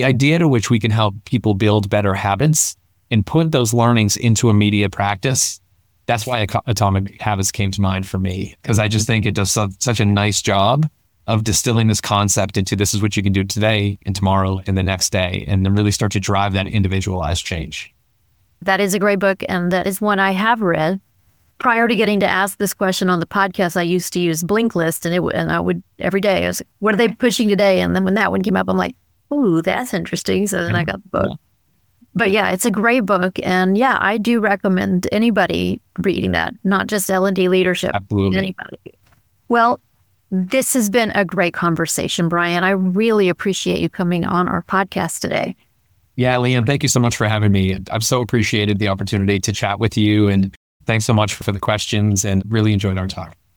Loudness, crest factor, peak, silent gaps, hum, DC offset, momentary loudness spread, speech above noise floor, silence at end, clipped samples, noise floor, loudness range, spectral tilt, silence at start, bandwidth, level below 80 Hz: -17 LUFS; 14 dB; -2 dBFS; 50.56-50.80 s; none; 0.1%; 6 LU; 45 dB; 0.25 s; under 0.1%; -62 dBFS; 3 LU; -5 dB/octave; 0 s; 20 kHz; -44 dBFS